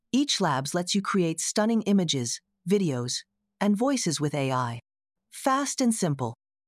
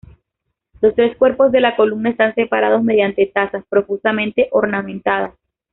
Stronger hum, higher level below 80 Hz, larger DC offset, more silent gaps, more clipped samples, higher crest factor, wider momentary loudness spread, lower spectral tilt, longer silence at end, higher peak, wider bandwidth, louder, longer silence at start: neither; second, -72 dBFS vs -52 dBFS; neither; neither; neither; about the same, 16 dB vs 14 dB; about the same, 8 LU vs 6 LU; about the same, -4.5 dB/octave vs -3.5 dB/octave; about the same, 0.35 s vs 0.45 s; second, -12 dBFS vs -2 dBFS; first, 14 kHz vs 4.1 kHz; second, -26 LUFS vs -16 LUFS; second, 0.15 s vs 0.8 s